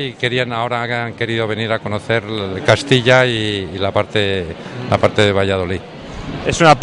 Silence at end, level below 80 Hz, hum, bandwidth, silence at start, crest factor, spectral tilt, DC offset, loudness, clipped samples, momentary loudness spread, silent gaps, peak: 0 s; -42 dBFS; none; 11 kHz; 0 s; 16 dB; -5 dB/octave; under 0.1%; -16 LUFS; under 0.1%; 11 LU; none; 0 dBFS